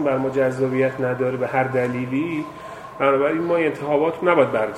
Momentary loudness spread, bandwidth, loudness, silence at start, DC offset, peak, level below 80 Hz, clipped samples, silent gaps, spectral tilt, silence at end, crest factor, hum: 8 LU; 12.5 kHz; -21 LUFS; 0 s; under 0.1%; -2 dBFS; -60 dBFS; under 0.1%; none; -7.5 dB/octave; 0 s; 20 dB; none